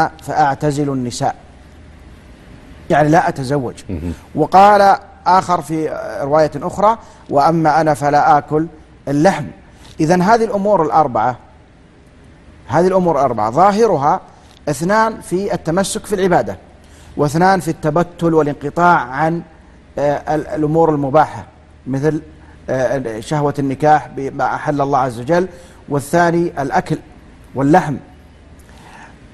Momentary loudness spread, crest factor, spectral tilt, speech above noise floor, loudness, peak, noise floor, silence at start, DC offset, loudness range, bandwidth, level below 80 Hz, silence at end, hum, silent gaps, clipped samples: 12 LU; 16 dB; -6.5 dB/octave; 30 dB; -15 LUFS; 0 dBFS; -44 dBFS; 0 s; under 0.1%; 4 LU; 12.5 kHz; -42 dBFS; 0.05 s; none; none; under 0.1%